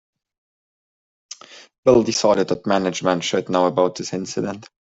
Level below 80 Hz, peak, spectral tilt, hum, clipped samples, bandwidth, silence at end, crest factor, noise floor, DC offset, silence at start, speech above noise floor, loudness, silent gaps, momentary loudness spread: -56 dBFS; -2 dBFS; -4.5 dB/octave; none; under 0.1%; 8 kHz; 0.15 s; 18 dB; under -90 dBFS; under 0.1%; 1.3 s; over 71 dB; -20 LUFS; 1.78-1.83 s; 19 LU